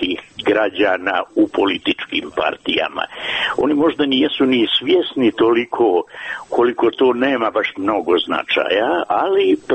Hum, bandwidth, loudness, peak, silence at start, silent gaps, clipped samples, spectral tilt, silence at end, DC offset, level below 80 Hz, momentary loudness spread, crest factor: none; 8.4 kHz; -17 LUFS; -4 dBFS; 0 s; none; under 0.1%; -5.5 dB/octave; 0 s; under 0.1%; -56 dBFS; 6 LU; 12 dB